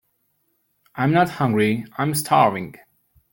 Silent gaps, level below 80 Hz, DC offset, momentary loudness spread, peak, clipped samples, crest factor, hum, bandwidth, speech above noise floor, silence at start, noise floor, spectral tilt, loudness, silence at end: none; -60 dBFS; under 0.1%; 14 LU; -2 dBFS; under 0.1%; 20 dB; none; 17 kHz; 49 dB; 0.95 s; -69 dBFS; -5.5 dB/octave; -20 LUFS; 0.55 s